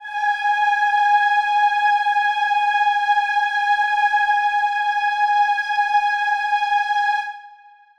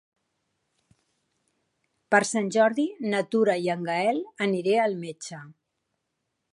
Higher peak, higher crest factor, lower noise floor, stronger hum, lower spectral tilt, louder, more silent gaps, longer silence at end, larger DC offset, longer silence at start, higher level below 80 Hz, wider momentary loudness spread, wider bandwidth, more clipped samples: about the same, -6 dBFS vs -4 dBFS; second, 12 dB vs 22 dB; second, -47 dBFS vs -80 dBFS; neither; second, 3.5 dB/octave vs -4.5 dB/octave; first, -18 LUFS vs -25 LUFS; neither; second, 0.5 s vs 1.05 s; neither; second, 0 s vs 2.1 s; first, -66 dBFS vs -80 dBFS; second, 3 LU vs 13 LU; second, 9.8 kHz vs 11.5 kHz; neither